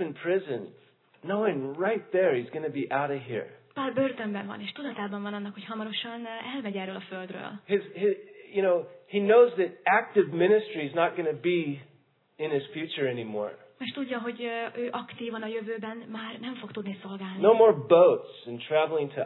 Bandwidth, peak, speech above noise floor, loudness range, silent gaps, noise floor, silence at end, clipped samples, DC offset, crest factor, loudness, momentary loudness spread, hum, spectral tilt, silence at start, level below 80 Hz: 4.3 kHz; -6 dBFS; 36 dB; 10 LU; none; -64 dBFS; 0 s; under 0.1%; under 0.1%; 20 dB; -28 LUFS; 17 LU; none; -9.5 dB/octave; 0 s; -88 dBFS